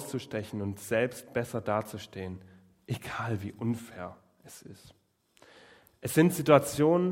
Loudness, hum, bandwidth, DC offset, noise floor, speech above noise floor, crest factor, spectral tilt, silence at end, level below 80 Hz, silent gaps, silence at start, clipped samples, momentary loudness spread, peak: -30 LUFS; none; 16.5 kHz; under 0.1%; -62 dBFS; 33 dB; 24 dB; -6 dB/octave; 0 s; -66 dBFS; none; 0 s; under 0.1%; 23 LU; -6 dBFS